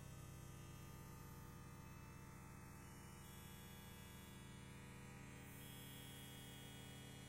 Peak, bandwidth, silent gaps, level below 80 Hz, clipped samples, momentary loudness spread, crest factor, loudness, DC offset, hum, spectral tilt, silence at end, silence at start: -44 dBFS; 16 kHz; none; -66 dBFS; under 0.1%; 3 LU; 12 dB; -58 LUFS; under 0.1%; none; -4.5 dB/octave; 0 s; 0 s